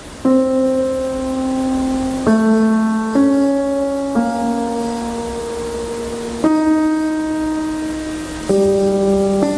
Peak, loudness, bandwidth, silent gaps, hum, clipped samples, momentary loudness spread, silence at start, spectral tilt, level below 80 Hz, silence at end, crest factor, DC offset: -2 dBFS; -17 LUFS; 11 kHz; none; none; under 0.1%; 9 LU; 0 s; -6 dB/octave; -40 dBFS; 0 s; 14 dB; under 0.1%